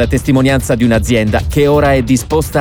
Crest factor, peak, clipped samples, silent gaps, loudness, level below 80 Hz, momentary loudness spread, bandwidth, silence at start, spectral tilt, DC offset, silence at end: 10 dB; 0 dBFS; under 0.1%; none; -12 LUFS; -24 dBFS; 3 LU; over 20 kHz; 0 s; -6 dB/octave; under 0.1%; 0 s